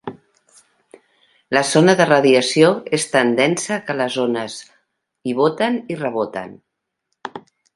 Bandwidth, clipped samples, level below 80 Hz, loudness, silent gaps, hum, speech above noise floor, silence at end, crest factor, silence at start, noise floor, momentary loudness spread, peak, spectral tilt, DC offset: 11.5 kHz; under 0.1%; -66 dBFS; -17 LUFS; none; none; 58 dB; 0.35 s; 18 dB; 0.05 s; -75 dBFS; 21 LU; 0 dBFS; -4.5 dB/octave; under 0.1%